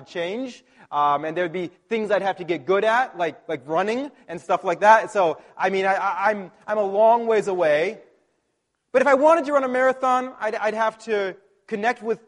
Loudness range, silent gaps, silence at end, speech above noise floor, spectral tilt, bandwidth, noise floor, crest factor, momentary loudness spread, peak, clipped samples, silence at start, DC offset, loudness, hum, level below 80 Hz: 4 LU; none; 0.1 s; 52 dB; -5 dB/octave; 11 kHz; -74 dBFS; 20 dB; 12 LU; -2 dBFS; under 0.1%; 0 s; under 0.1%; -22 LUFS; none; -72 dBFS